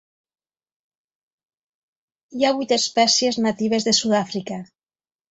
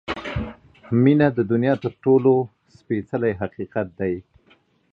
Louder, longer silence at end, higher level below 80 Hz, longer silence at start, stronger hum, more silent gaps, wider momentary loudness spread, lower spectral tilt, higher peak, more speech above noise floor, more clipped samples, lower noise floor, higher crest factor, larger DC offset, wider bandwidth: about the same, -19 LUFS vs -21 LUFS; about the same, 0.65 s vs 0.7 s; second, -66 dBFS vs -46 dBFS; first, 2.3 s vs 0.1 s; neither; neither; about the same, 14 LU vs 13 LU; second, -3 dB/octave vs -9.5 dB/octave; about the same, -4 dBFS vs -4 dBFS; first, over 70 dB vs 39 dB; neither; first, under -90 dBFS vs -59 dBFS; about the same, 20 dB vs 18 dB; neither; first, 8.4 kHz vs 6.8 kHz